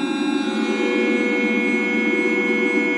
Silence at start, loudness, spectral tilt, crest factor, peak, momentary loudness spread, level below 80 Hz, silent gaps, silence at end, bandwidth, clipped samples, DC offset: 0 s; -19 LUFS; -5 dB/octave; 14 dB; -6 dBFS; 3 LU; -78 dBFS; none; 0 s; 11.5 kHz; under 0.1%; under 0.1%